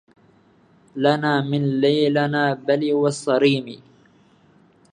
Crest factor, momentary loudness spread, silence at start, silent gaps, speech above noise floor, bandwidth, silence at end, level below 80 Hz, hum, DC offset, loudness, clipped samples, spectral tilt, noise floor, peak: 18 dB; 4 LU; 0.95 s; none; 36 dB; 10 kHz; 1.15 s; -70 dBFS; none; under 0.1%; -20 LUFS; under 0.1%; -6 dB/octave; -55 dBFS; -2 dBFS